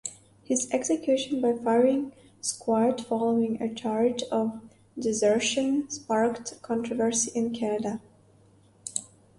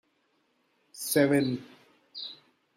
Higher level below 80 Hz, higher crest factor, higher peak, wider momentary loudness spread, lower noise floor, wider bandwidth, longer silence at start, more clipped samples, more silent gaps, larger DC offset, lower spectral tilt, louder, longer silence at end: first, -68 dBFS vs -74 dBFS; about the same, 18 dB vs 20 dB; about the same, -10 dBFS vs -10 dBFS; second, 11 LU vs 17 LU; second, -59 dBFS vs -72 dBFS; second, 11.5 kHz vs 16 kHz; second, 0.05 s vs 0.95 s; neither; neither; neither; about the same, -3.5 dB/octave vs -4.5 dB/octave; about the same, -27 LUFS vs -27 LUFS; about the same, 0.35 s vs 0.45 s